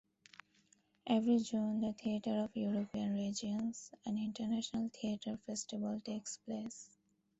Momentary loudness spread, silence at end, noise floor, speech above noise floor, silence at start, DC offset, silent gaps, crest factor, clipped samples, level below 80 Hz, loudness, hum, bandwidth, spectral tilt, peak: 14 LU; 0.55 s; -73 dBFS; 35 dB; 1.05 s; under 0.1%; none; 18 dB; under 0.1%; -74 dBFS; -39 LUFS; none; 8.2 kHz; -5 dB/octave; -22 dBFS